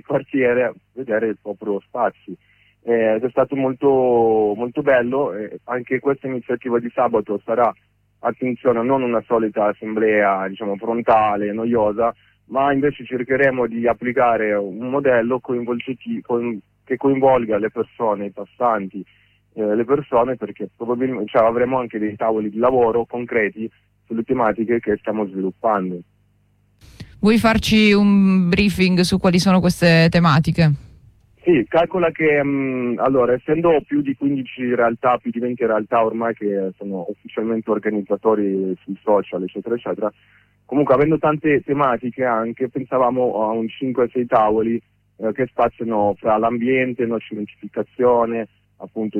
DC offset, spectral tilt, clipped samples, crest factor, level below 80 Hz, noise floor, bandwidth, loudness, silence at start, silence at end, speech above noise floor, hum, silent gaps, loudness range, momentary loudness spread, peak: under 0.1%; -7 dB/octave; under 0.1%; 16 dB; -48 dBFS; -60 dBFS; 14.5 kHz; -19 LUFS; 0.1 s; 0 s; 41 dB; none; none; 5 LU; 11 LU; -4 dBFS